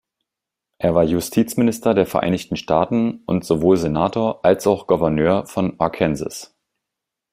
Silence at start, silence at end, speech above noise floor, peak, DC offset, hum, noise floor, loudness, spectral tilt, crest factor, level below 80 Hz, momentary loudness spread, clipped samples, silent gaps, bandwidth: 0.8 s; 0.9 s; 66 dB; -2 dBFS; under 0.1%; none; -85 dBFS; -19 LUFS; -6.5 dB/octave; 18 dB; -48 dBFS; 7 LU; under 0.1%; none; 16 kHz